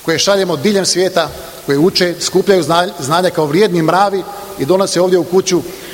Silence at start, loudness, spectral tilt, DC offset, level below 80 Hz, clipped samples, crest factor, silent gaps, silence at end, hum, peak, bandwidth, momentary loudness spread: 0 s; -13 LUFS; -4 dB/octave; under 0.1%; -48 dBFS; under 0.1%; 14 dB; none; 0 s; none; 0 dBFS; 17 kHz; 6 LU